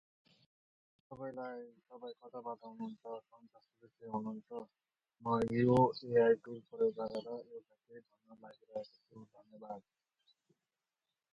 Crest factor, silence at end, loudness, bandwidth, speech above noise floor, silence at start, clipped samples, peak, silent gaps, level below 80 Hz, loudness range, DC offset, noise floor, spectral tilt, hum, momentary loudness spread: 22 dB; 1.55 s; -37 LUFS; 8.4 kHz; over 52 dB; 1.1 s; under 0.1%; -18 dBFS; none; -74 dBFS; 19 LU; under 0.1%; under -90 dBFS; -8.5 dB/octave; none; 25 LU